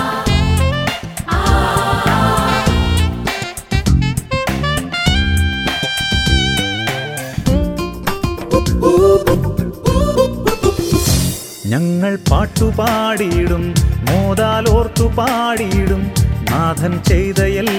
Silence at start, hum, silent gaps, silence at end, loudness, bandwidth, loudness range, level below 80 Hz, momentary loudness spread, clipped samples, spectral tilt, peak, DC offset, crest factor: 0 s; none; none; 0 s; -15 LUFS; 18.5 kHz; 2 LU; -22 dBFS; 6 LU; under 0.1%; -5 dB/octave; 0 dBFS; under 0.1%; 14 dB